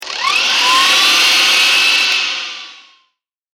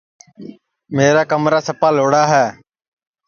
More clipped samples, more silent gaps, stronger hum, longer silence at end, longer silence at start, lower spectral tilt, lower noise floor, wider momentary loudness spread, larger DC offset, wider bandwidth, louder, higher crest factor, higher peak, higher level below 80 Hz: neither; neither; neither; about the same, 0.8 s vs 0.75 s; second, 0 s vs 0.4 s; second, 2.5 dB/octave vs -5 dB/octave; first, -66 dBFS vs -38 dBFS; first, 11 LU vs 5 LU; neither; first, 16.5 kHz vs 7.2 kHz; first, -9 LUFS vs -15 LUFS; about the same, 14 dB vs 16 dB; about the same, 0 dBFS vs 0 dBFS; about the same, -60 dBFS vs -60 dBFS